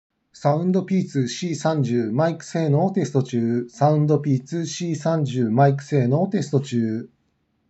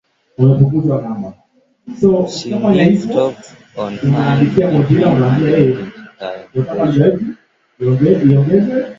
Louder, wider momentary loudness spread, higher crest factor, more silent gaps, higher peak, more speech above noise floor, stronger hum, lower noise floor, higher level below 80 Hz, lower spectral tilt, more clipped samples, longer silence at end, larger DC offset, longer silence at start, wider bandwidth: second, -22 LUFS vs -13 LUFS; second, 6 LU vs 15 LU; about the same, 18 dB vs 14 dB; neither; second, -4 dBFS vs 0 dBFS; first, 48 dB vs 23 dB; neither; first, -69 dBFS vs -36 dBFS; second, -72 dBFS vs -46 dBFS; second, -7 dB/octave vs -8.5 dB/octave; neither; first, 0.65 s vs 0.05 s; neither; about the same, 0.35 s vs 0.4 s; about the same, 8.2 kHz vs 7.6 kHz